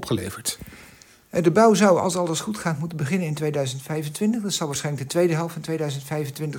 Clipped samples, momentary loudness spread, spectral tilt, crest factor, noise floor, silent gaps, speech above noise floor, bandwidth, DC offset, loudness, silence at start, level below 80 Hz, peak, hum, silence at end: under 0.1%; 12 LU; -5 dB/octave; 20 dB; -50 dBFS; none; 27 dB; 18 kHz; under 0.1%; -23 LUFS; 0 s; -60 dBFS; -4 dBFS; none; 0 s